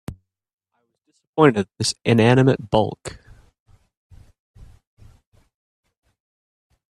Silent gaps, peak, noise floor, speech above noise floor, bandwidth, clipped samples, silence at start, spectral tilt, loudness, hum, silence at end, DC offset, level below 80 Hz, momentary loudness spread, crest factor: 0.53-0.58 s, 1.27-1.33 s; 0 dBFS; -73 dBFS; 55 dB; 12.5 kHz; under 0.1%; 0.1 s; -6 dB/octave; -18 LUFS; none; 3.85 s; under 0.1%; -52 dBFS; 20 LU; 22 dB